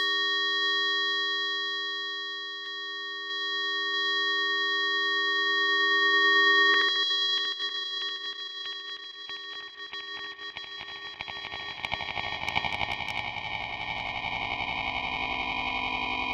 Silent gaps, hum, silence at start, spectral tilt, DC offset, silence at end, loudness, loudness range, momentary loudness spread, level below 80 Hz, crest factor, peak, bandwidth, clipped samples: none; none; 0 s; -2 dB/octave; under 0.1%; 0 s; -27 LUFS; 13 LU; 15 LU; -58 dBFS; 20 dB; -8 dBFS; 9.6 kHz; under 0.1%